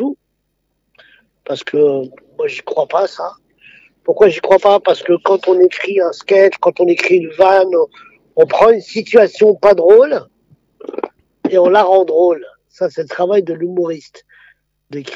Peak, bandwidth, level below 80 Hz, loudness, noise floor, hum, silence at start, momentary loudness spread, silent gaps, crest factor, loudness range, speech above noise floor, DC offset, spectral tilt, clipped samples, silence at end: 0 dBFS; 7.8 kHz; -58 dBFS; -13 LUFS; -68 dBFS; 50 Hz at -65 dBFS; 0 s; 16 LU; none; 14 dB; 7 LU; 56 dB; under 0.1%; -5.5 dB/octave; under 0.1%; 0 s